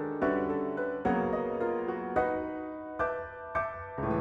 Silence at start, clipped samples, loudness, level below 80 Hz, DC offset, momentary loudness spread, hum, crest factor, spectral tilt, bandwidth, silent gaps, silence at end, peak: 0 s; under 0.1%; -32 LUFS; -54 dBFS; under 0.1%; 7 LU; none; 16 dB; -9 dB/octave; 7.4 kHz; none; 0 s; -16 dBFS